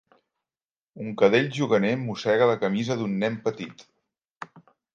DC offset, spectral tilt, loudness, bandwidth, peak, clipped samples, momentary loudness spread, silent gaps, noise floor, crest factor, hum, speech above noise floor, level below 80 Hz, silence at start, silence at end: under 0.1%; -6 dB/octave; -24 LUFS; 7.6 kHz; -6 dBFS; under 0.1%; 21 LU; 4.32-4.36 s; under -90 dBFS; 20 dB; none; over 66 dB; -70 dBFS; 0.95 s; 0.35 s